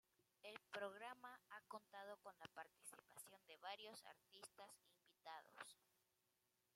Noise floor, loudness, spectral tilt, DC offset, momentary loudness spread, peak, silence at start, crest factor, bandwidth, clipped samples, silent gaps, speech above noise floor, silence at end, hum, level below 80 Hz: -88 dBFS; -59 LUFS; -1.5 dB/octave; under 0.1%; 10 LU; -38 dBFS; 0.2 s; 24 dB; 16 kHz; under 0.1%; none; 27 dB; 1 s; none; under -90 dBFS